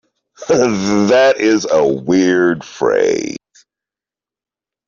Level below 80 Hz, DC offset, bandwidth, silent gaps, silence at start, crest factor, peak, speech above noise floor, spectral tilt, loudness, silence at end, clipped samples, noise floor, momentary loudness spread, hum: -54 dBFS; under 0.1%; 7.4 kHz; none; 0.4 s; 14 dB; -2 dBFS; 76 dB; -5 dB/octave; -14 LUFS; 1.5 s; under 0.1%; -89 dBFS; 9 LU; none